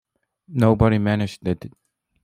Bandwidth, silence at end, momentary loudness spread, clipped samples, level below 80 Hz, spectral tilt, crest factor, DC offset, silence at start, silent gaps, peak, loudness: 12 kHz; 0.55 s; 13 LU; under 0.1%; -42 dBFS; -8 dB/octave; 20 dB; under 0.1%; 0.5 s; none; -2 dBFS; -21 LUFS